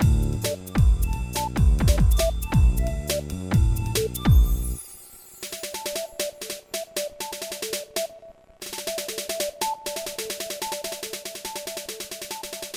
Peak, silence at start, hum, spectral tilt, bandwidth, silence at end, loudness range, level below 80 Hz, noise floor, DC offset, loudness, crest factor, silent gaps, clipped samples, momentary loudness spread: -6 dBFS; 0 s; none; -4.5 dB/octave; 18 kHz; 0 s; 8 LU; -26 dBFS; -47 dBFS; under 0.1%; -26 LUFS; 18 dB; none; under 0.1%; 12 LU